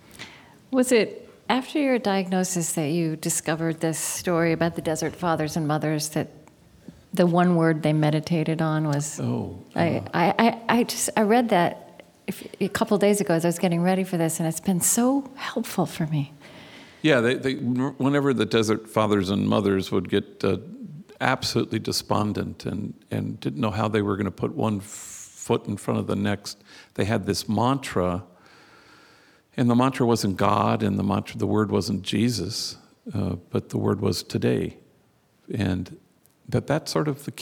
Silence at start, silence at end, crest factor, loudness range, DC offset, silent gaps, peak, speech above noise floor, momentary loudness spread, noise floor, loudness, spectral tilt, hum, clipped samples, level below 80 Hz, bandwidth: 0.2 s; 0 s; 22 dB; 5 LU; under 0.1%; none; -2 dBFS; 38 dB; 11 LU; -62 dBFS; -24 LUFS; -5 dB/octave; none; under 0.1%; -58 dBFS; 19.5 kHz